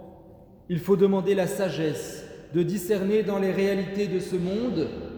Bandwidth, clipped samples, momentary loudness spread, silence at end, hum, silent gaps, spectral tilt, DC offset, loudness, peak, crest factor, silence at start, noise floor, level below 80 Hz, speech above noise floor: over 20 kHz; under 0.1%; 9 LU; 0 s; none; none; -6.5 dB/octave; under 0.1%; -26 LUFS; -10 dBFS; 16 dB; 0 s; -50 dBFS; -54 dBFS; 25 dB